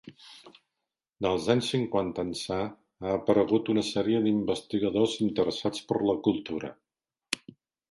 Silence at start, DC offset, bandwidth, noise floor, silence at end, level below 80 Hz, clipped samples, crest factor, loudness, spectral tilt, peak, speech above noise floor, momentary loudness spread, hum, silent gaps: 0.05 s; under 0.1%; 11.5 kHz; under -90 dBFS; 0.55 s; -60 dBFS; under 0.1%; 22 dB; -28 LUFS; -5.5 dB/octave; -6 dBFS; over 62 dB; 11 LU; none; none